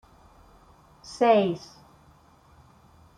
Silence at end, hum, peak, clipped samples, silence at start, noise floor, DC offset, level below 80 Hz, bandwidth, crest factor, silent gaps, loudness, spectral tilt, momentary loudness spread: 1.6 s; none; -8 dBFS; under 0.1%; 1.05 s; -57 dBFS; under 0.1%; -62 dBFS; 10.5 kHz; 22 dB; none; -23 LUFS; -6 dB/octave; 28 LU